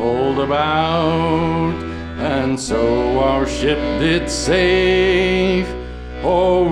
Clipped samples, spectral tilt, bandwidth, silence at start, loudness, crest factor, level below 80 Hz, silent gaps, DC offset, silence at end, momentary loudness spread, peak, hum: under 0.1%; -5.5 dB/octave; 11 kHz; 0 s; -17 LUFS; 14 dB; -32 dBFS; none; under 0.1%; 0 s; 9 LU; -2 dBFS; none